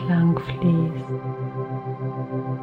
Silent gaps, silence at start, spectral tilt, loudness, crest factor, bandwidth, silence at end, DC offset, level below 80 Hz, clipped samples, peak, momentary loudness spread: none; 0 s; -10 dB/octave; -25 LUFS; 14 dB; 4.5 kHz; 0 s; under 0.1%; -52 dBFS; under 0.1%; -10 dBFS; 10 LU